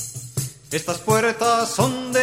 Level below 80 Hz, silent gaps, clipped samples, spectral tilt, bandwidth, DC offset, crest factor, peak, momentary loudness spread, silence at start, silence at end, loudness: -56 dBFS; none; under 0.1%; -4 dB/octave; 16 kHz; under 0.1%; 18 dB; -4 dBFS; 10 LU; 0 s; 0 s; -21 LUFS